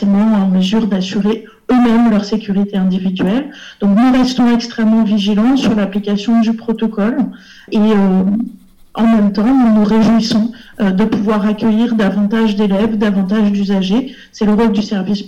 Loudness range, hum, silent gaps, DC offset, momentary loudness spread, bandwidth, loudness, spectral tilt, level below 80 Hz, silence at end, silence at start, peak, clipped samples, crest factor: 2 LU; none; none; under 0.1%; 7 LU; 7.8 kHz; -13 LUFS; -7 dB/octave; -42 dBFS; 0 s; 0 s; -8 dBFS; under 0.1%; 6 dB